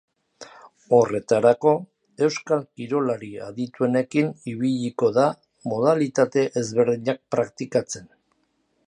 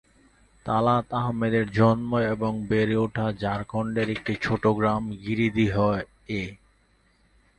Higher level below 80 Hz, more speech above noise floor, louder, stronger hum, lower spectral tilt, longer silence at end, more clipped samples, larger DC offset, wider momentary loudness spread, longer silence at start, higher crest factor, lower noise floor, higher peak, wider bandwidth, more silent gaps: second, -68 dBFS vs -50 dBFS; first, 47 dB vs 39 dB; about the same, -23 LUFS vs -25 LUFS; neither; second, -6 dB/octave vs -8 dB/octave; second, 0.85 s vs 1.05 s; neither; neither; about the same, 10 LU vs 9 LU; second, 0.4 s vs 0.65 s; about the same, 20 dB vs 20 dB; first, -69 dBFS vs -63 dBFS; about the same, -4 dBFS vs -6 dBFS; about the same, 10 kHz vs 9.2 kHz; neither